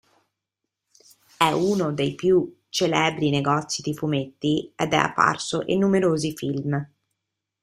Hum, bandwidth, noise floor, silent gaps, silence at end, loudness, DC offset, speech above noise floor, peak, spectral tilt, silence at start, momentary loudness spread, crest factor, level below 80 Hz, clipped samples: none; 15.5 kHz; -83 dBFS; none; 0.75 s; -23 LUFS; under 0.1%; 61 dB; -2 dBFS; -5 dB/octave; 1.4 s; 7 LU; 22 dB; -60 dBFS; under 0.1%